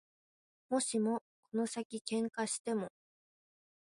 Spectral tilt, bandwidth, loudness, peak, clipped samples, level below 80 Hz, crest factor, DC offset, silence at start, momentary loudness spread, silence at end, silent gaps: -3.5 dB/octave; 11.5 kHz; -37 LUFS; -20 dBFS; under 0.1%; -84 dBFS; 18 dB; under 0.1%; 0.7 s; 7 LU; 1 s; 1.21-1.43 s, 1.85-1.90 s, 2.01-2.05 s, 2.59-2.65 s